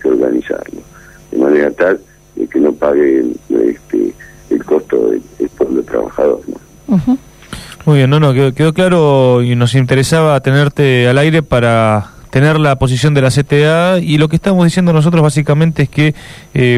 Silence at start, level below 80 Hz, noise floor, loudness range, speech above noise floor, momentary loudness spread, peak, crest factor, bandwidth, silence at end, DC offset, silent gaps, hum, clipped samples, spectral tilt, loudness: 0.05 s; -38 dBFS; -30 dBFS; 5 LU; 20 dB; 10 LU; -2 dBFS; 10 dB; 13.5 kHz; 0 s; under 0.1%; none; none; under 0.1%; -7 dB/octave; -12 LUFS